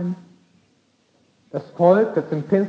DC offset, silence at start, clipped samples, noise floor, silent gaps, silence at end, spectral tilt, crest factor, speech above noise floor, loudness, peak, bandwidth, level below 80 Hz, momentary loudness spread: under 0.1%; 0 s; under 0.1%; -62 dBFS; none; 0 s; -9.5 dB/octave; 20 dB; 43 dB; -20 LUFS; -2 dBFS; 7 kHz; -76 dBFS; 17 LU